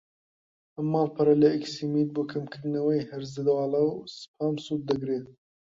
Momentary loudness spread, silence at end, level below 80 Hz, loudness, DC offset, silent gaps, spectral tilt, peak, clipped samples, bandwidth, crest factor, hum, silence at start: 11 LU; 0.45 s; -68 dBFS; -27 LUFS; under 0.1%; 4.28-4.34 s; -7.5 dB/octave; -10 dBFS; under 0.1%; 7.6 kHz; 18 dB; none; 0.8 s